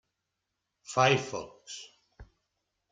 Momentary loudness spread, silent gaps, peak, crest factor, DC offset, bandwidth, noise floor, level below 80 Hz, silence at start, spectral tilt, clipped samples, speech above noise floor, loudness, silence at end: 19 LU; none; -12 dBFS; 22 dB; under 0.1%; 9.4 kHz; -84 dBFS; -64 dBFS; 0.9 s; -4 dB/octave; under 0.1%; 55 dB; -28 LUFS; 0.7 s